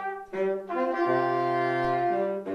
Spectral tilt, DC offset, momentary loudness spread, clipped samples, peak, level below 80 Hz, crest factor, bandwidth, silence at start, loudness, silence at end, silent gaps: -7.5 dB/octave; under 0.1%; 4 LU; under 0.1%; -14 dBFS; -62 dBFS; 12 dB; 6.8 kHz; 0 s; -27 LUFS; 0 s; none